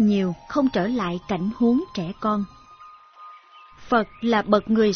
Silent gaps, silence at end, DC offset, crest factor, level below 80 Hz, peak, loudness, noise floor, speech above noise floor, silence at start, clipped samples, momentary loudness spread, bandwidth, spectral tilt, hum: none; 0 s; under 0.1%; 18 dB; -52 dBFS; -6 dBFS; -23 LUFS; -48 dBFS; 26 dB; 0 s; under 0.1%; 7 LU; 6.6 kHz; -7 dB/octave; none